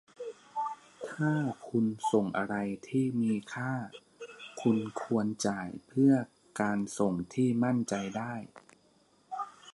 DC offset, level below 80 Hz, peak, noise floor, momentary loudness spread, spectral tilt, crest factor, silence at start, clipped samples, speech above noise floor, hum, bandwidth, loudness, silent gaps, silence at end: under 0.1%; -70 dBFS; -14 dBFS; -66 dBFS; 16 LU; -6.5 dB/octave; 18 dB; 0.2 s; under 0.1%; 36 dB; none; 11.5 kHz; -32 LUFS; none; 0.05 s